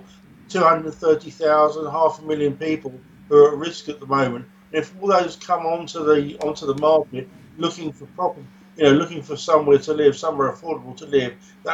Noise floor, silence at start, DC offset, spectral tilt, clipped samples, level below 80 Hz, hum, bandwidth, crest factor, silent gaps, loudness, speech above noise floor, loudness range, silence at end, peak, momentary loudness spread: -47 dBFS; 0.5 s; under 0.1%; -5.5 dB/octave; under 0.1%; -58 dBFS; none; 8 kHz; 18 dB; none; -20 LUFS; 27 dB; 3 LU; 0 s; -2 dBFS; 14 LU